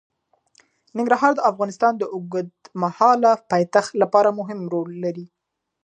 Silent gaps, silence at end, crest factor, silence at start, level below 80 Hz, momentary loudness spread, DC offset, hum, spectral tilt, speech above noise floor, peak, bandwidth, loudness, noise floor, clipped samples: none; 0.6 s; 20 dB; 0.95 s; -74 dBFS; 12 LU; under 0.1%; none; -6 dB/octave; 40 dB; -2 dBFS; 9.8 kHz; -20 LUFS; -60 dBFS; under 0.1%